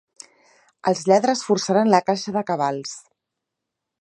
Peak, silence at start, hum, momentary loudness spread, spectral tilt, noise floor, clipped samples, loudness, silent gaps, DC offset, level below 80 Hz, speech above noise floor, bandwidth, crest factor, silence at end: -2 dBFS; 0.85 s; none; 12 LU; -4.5 dB/octave; -83 dBFS; under 0.1%; -20 LUFS; none; under 0.1%; -72 dBFS; 63 dB; 11 kHz; 20 dB; 1.05 s